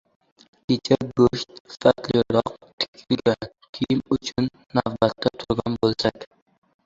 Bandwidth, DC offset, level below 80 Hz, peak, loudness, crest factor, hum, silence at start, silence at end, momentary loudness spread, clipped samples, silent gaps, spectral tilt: 7.8 kHz; under 0.1%; -50 dBFS; -2 dBFS; -23 LUFS; 22 dB; none; 0.7 s; 0.6 s; 11 LU; under 0.1%; 1.60-1.65 s, 2.73-2.78 s, 2.88-2.93 s, 3.69-3.73 s; -6 dB/octave